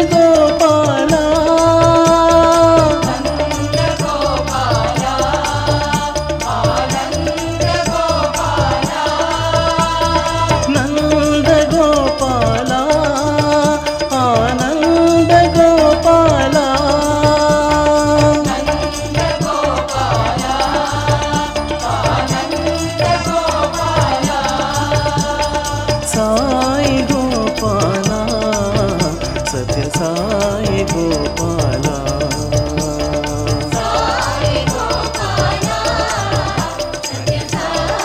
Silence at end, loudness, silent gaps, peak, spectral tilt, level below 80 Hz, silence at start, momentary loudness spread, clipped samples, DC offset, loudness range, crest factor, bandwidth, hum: 0 s; -14 LUFS; none; 0 dBFS; -5 dB/octave; -28 dBFS; 0 s; 8 LU; under 0.1%; under 0.1%; 5 LU; 14 dB; 16.5 kHz; none